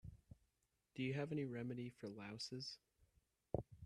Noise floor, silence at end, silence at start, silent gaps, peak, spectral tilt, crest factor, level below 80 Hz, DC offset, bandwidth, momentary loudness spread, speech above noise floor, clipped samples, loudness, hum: -86 dBFS; 0 s; 0.05 s; none; -24 dBFS; -6 dB/octave; 24 dB; -70 dBFS; under 0.1%; 12.5 kHz; 18 LU; 39 dB; under 0.1%; -48 LUFS; none